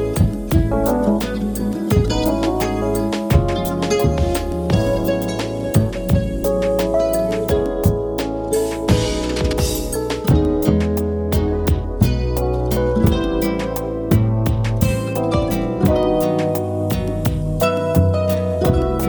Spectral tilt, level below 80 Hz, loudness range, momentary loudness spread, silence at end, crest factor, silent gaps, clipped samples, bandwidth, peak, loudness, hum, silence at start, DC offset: -6.5 dB/octave; -26 dBFS; 1 LU; 4 LU; 0 s; 18 dB; none; under 0.1%; over 20 kHz; 0 dBFS; -19 LUFS; none; 0 s; under 0.1%